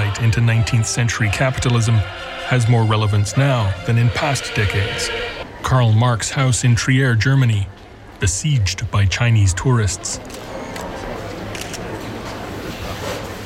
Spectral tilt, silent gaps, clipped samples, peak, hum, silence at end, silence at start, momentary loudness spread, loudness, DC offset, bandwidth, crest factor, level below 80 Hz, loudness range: -5 dB/octave; none; under 0.1%; -6 dBFS; none; 0 s; 0 s; 13 LU; -18 LUFS; under 0.1%; 14 kHz; 12 dB; -36 dBFS; 5 LU